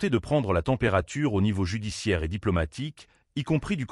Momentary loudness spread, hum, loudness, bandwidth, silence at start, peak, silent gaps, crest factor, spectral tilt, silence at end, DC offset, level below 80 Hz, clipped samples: 9 LU; none; -27 LUFS; 12 kHz; 0 s; -12 dBFS; none; 16 dB; -6.5 dB/octave; 0.05 s; under 0.1%; -42 dBFS; under 0.1%